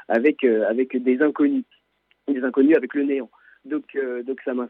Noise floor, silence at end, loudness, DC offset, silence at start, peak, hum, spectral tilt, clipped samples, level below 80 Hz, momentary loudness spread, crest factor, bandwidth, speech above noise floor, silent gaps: -67 dBFS; 0 s; -22 LUFS; under 0.1%; 0.1 s; -6 dBFS; none; -8 dB/octave; under 0.1%; -80 dBFS; 11 LU; 14 dB; 4.1 kHz; 46 dB; none